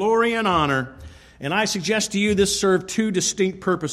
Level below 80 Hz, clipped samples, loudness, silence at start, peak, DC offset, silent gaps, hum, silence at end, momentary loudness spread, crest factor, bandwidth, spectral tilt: -48 dBFS; under 0.1%; -21 LUFS; 0 s; -6 dBFS; under 0.1%; none; none; 0 s; 6 LU; 14 dB; 15 kHz; -3.5 dB/octave